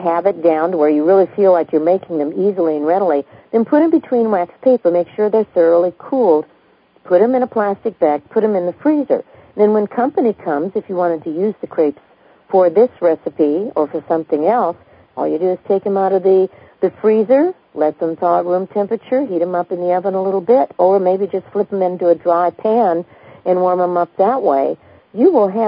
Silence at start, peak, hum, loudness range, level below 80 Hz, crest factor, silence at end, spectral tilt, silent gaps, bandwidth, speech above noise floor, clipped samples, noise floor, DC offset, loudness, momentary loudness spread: 0 s; 0 dBFS; none; 2 LU; -66 dBFS; 14 dB; 0 s; -12.5 dB/octave; none; 5.2 kHz; 36 dB; under 0.1%; -51 dBFS; under 0.1%; -16 LUFS; 7 LU